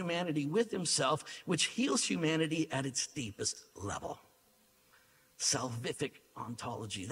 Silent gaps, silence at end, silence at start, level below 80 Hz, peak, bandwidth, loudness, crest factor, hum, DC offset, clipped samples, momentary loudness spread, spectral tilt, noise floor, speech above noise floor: none; 0 s; 0 s; -70 dBFS; -16 dBFS; 16 kHz; -34 LUFS; 20 dB; none; under 0.1%; under 0.1%; 11 LU; -3.5 dB/octave; -68 dBFS; 33 dB